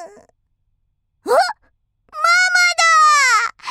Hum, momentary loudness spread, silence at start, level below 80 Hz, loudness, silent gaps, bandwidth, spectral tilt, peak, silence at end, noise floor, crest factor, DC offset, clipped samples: none; 9 LU; 0 s; -66 dBFS; -13 LUFS; none; 16 kHz; 2.5 dB/octave; -2 dBFS; 0 s; -67 dBFS; 14 dB; under 0.1%; under 0.1%